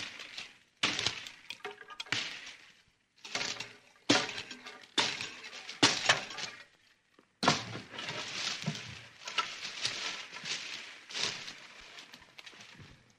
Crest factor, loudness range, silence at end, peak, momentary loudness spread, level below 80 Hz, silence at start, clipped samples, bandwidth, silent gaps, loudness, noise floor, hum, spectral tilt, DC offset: 28 dB; 6 LU; 0.2 s; -10 dBFS; 20 LU; -72 dBFS; 0 s; under 0.1%; 15.5 kHz; none; -34 LUFS; -68 dBFS; none; -2 dB/octave; under 0.1%